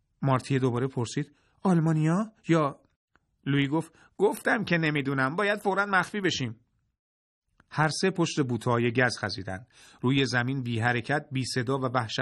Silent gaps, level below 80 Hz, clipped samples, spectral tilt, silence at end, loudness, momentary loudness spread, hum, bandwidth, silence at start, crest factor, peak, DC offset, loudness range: 2.96-3.08 s, 6.99-7.42 s; -64 dBFS; under 0.1%; -5.5 dB/octave; 0 s; -27 LUFS; 8 LU; none; 12.5 kHz; 0.2 s; 20 dB; -8 dBFS; under 0.1%; 2 LU